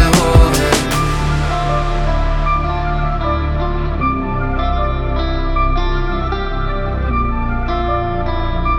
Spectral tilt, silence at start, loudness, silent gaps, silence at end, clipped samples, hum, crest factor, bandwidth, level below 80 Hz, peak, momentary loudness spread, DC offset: -5.5 dB/octave; 0 s; -17 LUFS; none; 0 s; under 0.1%; none; 14 dB; 17.5 kHz; -18 dBFS; 0 dBFS; 7 LU; under 0.1%